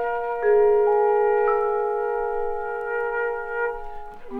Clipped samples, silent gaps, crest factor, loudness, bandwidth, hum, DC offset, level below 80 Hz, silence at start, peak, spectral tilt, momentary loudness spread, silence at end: under 0.1%; none; 12 dB; -22 LUFS; 3.5 kHz; none; under 0.1%; -46 dBFS; 0 s; -10 dBFS; -6.5 dB/octave; 10 LU; 0 s